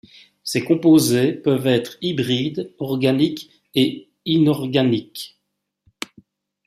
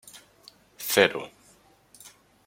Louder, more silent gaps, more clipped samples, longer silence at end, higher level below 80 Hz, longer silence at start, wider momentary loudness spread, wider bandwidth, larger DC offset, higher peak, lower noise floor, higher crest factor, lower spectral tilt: first, -19 LUFS vs -24 LUFS; neither; neither; first, 1.4 s vs 0.4 s; first, -60 dBFS vs -72 dBFS; first, 0.45 s vs 0.15 s; second, 20 LU vs 27 LU; about the same, 15 kHz vs 16.5 kHz; neither; about the same, -4 dBFS vs -2 dBFS; first, -76 dBFS vs -59 dBFS; second, 16 dB vs 28 dB; first, -5.5 dB/octave vs -2.5 dB/octave